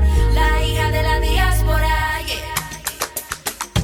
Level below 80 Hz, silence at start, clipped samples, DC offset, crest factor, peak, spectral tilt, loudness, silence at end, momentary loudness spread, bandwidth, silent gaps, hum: -20 dBFS; 0 s; under 0.1%; under 0.1%; 14 dB; -4 dBFS; -4 dB/octave; -19 LUFS; 0 s; 8 LU; 18 kHz; none; none